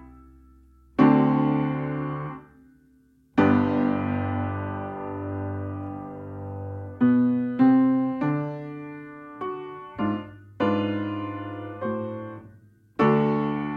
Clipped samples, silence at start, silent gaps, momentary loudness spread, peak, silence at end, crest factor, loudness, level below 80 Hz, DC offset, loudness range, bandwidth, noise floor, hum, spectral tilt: under 0.1%; 0 s; none; 17 LU; -6 dBFS; 0 s; 20 dB; -25 LUFS; -58 dBFS; under 0.1%; 6 LU; 5.2 kHz; -59 dBFS; none; -10 dB/octave